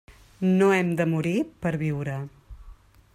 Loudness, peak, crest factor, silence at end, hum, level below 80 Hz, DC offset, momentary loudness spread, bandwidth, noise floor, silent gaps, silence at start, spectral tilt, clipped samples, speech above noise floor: -25 LUFS; -10 dBFS; 16 dB; 0.45 s; none; -52 dBFS; under 0.1%; 12 LU; 14 kHz; -49 dBFS; none; 0.1 s; -7.5 dB/octave; under 0.1%; 25 dB